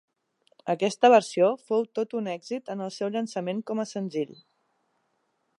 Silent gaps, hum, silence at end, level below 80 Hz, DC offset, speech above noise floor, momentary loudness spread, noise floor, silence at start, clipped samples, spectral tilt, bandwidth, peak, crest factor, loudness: none; none; 1.25 s; -84 dBFS; under 0.1%; 48 dB; 15 LU; -74 dBFS; 0.65 s; under 0.1%; -5 dB/octave; 11.5 kHz; -6 dBFS; 22 dB; -26 LUFS